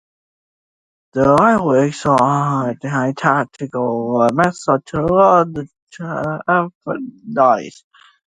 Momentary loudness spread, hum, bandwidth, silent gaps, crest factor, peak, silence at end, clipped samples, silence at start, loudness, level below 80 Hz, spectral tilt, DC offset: 14 LU; none; 11.5 kHz; 5.82-5.87 s, 6.75-6.81 s; 16 dB; 0 dBFS; 0.6 s; under 0.1%; 1.15 s; -16 LUFS; -50 dBFS; -7 dB/octave; under 0.1%